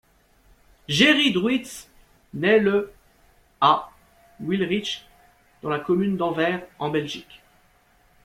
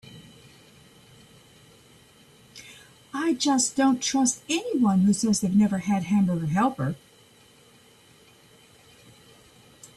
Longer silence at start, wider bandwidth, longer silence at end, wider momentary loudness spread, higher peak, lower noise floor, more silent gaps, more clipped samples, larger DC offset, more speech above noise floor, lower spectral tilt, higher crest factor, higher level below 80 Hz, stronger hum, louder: first, 0.9 s vs 0.05 s; first, 16 kHz vs 13 kHz; first, 1.05 s vs 0.1 s; second, 18 LU vs 21 LU; first, -2 dBFS vs -10 dBFS; first, -60 dBFS vs -55 dBFS; neither; neither; neither; first, 38 dB vs 32 dB; about the same, -4.5 dB/octave vs -4.5 dB/octave; first, 22 dB vs 16 dB; about the same, -60 dBFS vs -64 dBFS; neither; about the same, -22 LUFS vs -24 LUFS